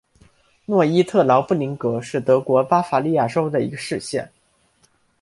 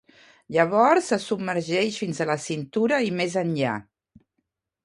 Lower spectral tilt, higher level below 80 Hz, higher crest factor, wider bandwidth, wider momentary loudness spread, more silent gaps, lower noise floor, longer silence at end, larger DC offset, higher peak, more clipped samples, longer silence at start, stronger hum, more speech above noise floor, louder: first, -6.5 dB/octave vs -5 dB/octave; first, -62 dBFS vs -68 dBFS; about the same, 18 dB vs 20 dB; about the same, 11.5 kHz vs 11.5 kHz; about the same, 9 LU vs 9 LU; neither; second, -61 dBFS vs -78 dBFS; about the same, 0.95 s vs 1.05 s; neither; first, -2 dBFS vs -6 dBFS; neither; first, 0.7 s vs 0.5 s; neither; second, 42 dB vs 55 dB; first, -19 LUFS vs -24 LUFS